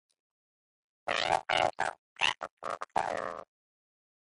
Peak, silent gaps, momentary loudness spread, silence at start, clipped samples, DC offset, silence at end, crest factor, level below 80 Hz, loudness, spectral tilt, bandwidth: -12 dBFS; 1.98-2.16 s, 2.51-2.57 s; 11 LU; 1.05 s; under 0.1%; under 0.1%; 0.8 s; 22 dB; -66 dBFS; -32 LUFS; -2 dB/octave; 11.5 kHz